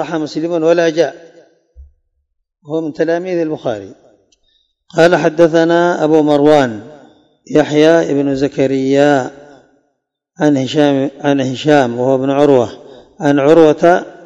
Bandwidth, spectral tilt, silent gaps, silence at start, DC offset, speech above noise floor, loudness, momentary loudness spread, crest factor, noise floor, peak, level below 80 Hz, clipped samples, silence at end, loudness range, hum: 8.8 kHz; -6 dB/octave; none; 0 s; under 0.1%; 57 dB; -13 LUFS; 10 LU; 14 dB; -69 dBFS; 0 dBFS; -52 dBFS; 0.7%; 0.15 s; 8 LU; none